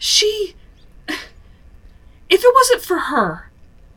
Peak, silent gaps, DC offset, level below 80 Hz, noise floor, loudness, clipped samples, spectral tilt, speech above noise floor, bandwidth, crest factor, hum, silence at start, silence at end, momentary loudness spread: 0 dBFS; none; under 0.1%; -46 dBFS; -44 dBFS; -16 LUFS; under 0.1%; -2 dB/octave; 28 dB; over 20 kHz; 18 dB; none; 0 s; 0.55 s; 17 LU